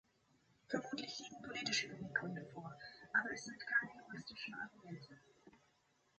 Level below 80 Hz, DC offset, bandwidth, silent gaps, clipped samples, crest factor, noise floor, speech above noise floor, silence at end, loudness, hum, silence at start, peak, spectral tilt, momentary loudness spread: -80 dBFS; under 0.1%; 8.4 kHz; none; under 0.1%; 24 dB; -77 dBFS; 33 dB; 0.6 s; -43 LUFS; none; 0.7 s; -22 dBFS; -3 dB/octave; 15 LU